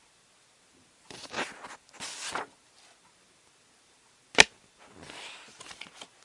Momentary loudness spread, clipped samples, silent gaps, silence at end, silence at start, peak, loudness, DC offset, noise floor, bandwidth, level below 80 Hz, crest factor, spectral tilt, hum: 26 LU; under 0.1%; none; 0.2 s; 1.1 s; 0 dBFS; -27 LUFS; under 0.1%; -63 dBFS; 12 kHz; -66 dBFS; 34 dB; 0 dB/octave; none